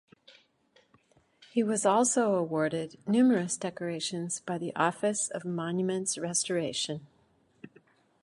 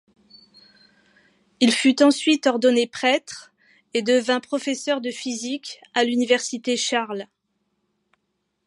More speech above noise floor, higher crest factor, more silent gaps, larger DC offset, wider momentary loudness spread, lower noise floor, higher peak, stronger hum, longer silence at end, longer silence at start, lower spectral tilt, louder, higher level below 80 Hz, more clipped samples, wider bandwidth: second, 38 dB vs 54 dB; about the same, 20 dB vs 20 dB; neither; neither; second, 10 LU vs 13 LU; second, -67 dBFS vs -75 dBFS; second, -12 dBFS vs -4 dBFS; neither; second, 0.55 s vs 1.45 s; second, 1.4 s vs 1.6 s; first, -4 dB/octave vs -2.5 dB/octave; second, -29 LUFS vs -21 LUFS; about the same, -76 dBFS vs -76 dBFS; neither; about the same, 11.5 kHz vs 11.5 kHz